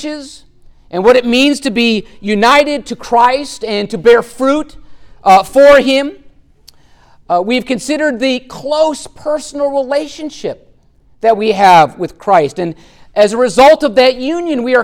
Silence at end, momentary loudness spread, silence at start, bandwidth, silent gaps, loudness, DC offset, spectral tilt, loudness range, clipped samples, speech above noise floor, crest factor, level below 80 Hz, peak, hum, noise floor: 0 s; 15 LU; 0 s; 17 kHz; none; -11 LUFS; under 0.1%; -4 dB/octave; 6 LU; under 0.1%; 36 dB; 12 dB; -44 dBFS; 0 dBFS; none; -47 dBFS